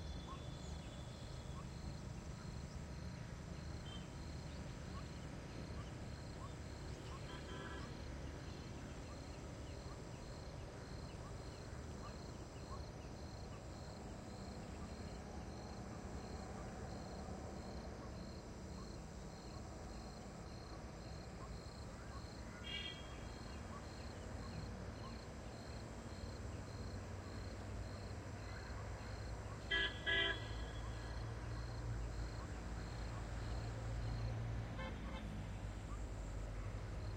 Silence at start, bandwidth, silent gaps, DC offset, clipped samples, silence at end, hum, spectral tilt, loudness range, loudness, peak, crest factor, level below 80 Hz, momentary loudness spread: 0 s; 16 kHz; none; under 0.1%; under 0.1%; 0 s; none; -5 dB/octave; 9 LU; -49 LUFS; -26 dBFS; 22 dB; -54 dBFS; 6 LU